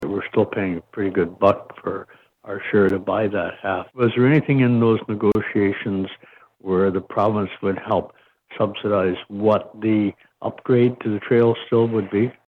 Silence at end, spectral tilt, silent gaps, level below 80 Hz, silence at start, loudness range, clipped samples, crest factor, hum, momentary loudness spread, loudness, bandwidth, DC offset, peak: 0.15 s; -9.5 dB/octave; none; -58 dBFS; 0 s; 3 LU; under 0.1%; 18 dB; none; 11 LU; -21 LUFS; 5.6 kHz; under 0.1%; -2 dBFS